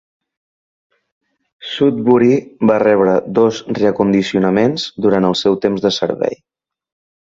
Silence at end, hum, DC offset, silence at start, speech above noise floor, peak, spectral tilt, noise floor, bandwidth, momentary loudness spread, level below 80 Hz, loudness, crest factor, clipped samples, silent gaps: 0.9 s; none; under 0.1%; 1.6 s; over 76 dB; 0 dBFS; -6 dB/octave; under -90 dBFS; 7.8 kHz; 7 LU; -54 dBFS; -15 LUFS; 16 dB; under 0.1%; none